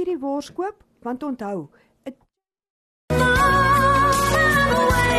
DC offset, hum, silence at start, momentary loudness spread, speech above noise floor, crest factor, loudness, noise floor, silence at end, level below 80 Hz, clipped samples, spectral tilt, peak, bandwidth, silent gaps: under 0.1%; none; 0 s; 17 LU; 41 dB; 14 dB; -19 LUFS; -68 dBFS; 0 s; -34 dBFS; under 0.1%; -4.5 dB/octave; -8 dBFS; 13 kHz; 2.70-3.08 s